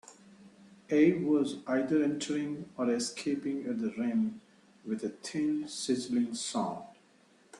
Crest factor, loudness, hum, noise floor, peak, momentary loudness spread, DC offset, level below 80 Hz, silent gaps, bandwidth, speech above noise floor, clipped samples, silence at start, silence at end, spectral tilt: 18 dB; -32 LUFS; none; -64 dBFS; -14 dBFS; 11 LU; under 0.1%; -74 dBFS; none; 11.5 kHz; 33 dB; under 0.1%; 0.1 s; 0 s; -5 dB/octave